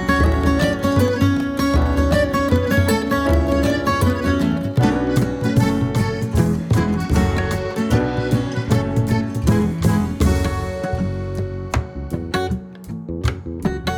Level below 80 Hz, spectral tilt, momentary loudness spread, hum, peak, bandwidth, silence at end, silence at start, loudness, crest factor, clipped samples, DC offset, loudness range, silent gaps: -28 dBFS; -6.5 dB/octave; 7 LU; none; -2 dBFS; 18 kHz; 0 s; 0 s; -19 LUFS; 16 dB; under 0.1%; under 0.1%; 4 LU; none